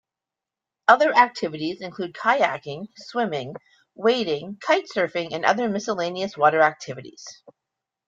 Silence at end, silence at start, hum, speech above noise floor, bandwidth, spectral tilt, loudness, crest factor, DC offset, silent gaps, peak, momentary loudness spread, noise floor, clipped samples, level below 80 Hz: 0.75 s; 0.9 s; none; 65 dB; 7.8 kHz; -4.5 dB/octave; -22 LUFS; 22 dB; under 0.1%; none; -2 dBFS; 18 LU; -88 dBFS; under 0.1%; -70 dBFS